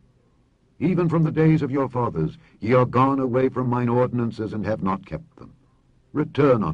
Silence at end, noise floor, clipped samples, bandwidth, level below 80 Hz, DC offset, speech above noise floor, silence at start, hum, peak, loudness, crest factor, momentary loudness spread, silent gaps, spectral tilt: 0 s; -61 dBFS; under 0.1%; 6.8 kHz; -52 dBFS; under 0.1%; 40 dB; 0.8 s; none; -6 dBFS; -22 LUFS; 16 dB; 10 LU; none; -9.5 dB/octave